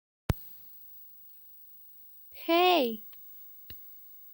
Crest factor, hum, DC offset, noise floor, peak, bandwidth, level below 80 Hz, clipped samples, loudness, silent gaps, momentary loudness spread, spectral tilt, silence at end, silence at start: 22 dB; none; under 0.1%; -52 dBFS; -12 dBFS; 17 kHz; -50 dBFS; under 0.1%; -28 LUFS; none; 23 LU; -5.5 dB/octave; 0.4 s; 0.3 s